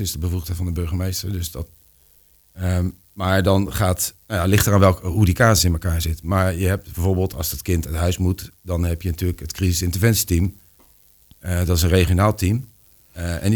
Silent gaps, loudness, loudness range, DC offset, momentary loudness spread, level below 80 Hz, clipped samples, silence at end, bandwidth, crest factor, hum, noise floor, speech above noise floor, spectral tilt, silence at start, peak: none; -20 LUFS; 5 LU; under 0.1%; 11 LU; -32 dBFS; under 0.1%; 0 s; over 20 kHz; 20 dB; none; -55 dBFS; 35 dB; -5 dB/octave; 0 s; 0 dBFS